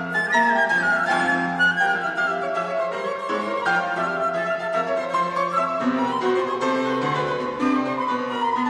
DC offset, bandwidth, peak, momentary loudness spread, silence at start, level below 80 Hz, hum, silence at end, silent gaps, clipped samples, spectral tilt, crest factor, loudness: under 0.1%; 12 kHz; -8 dBFS; 6 LU; 0 s; -64 dBFS; none; 0 s; none; under 0.1%; -5 dB/octave; 14 dB; -22 LUFS